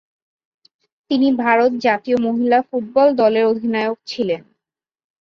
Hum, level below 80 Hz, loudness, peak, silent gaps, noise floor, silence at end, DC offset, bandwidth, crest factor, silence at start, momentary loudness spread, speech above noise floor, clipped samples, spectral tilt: none; -64 dBFS; -17 LUFS; -2 dBFS; none; -88 dBFS; 0.85 s; under 0.1%; 7.2 kHz; 16 dB; 1.1 s; 8 LU; 71 dB; under 0.1%; -6 dB/octave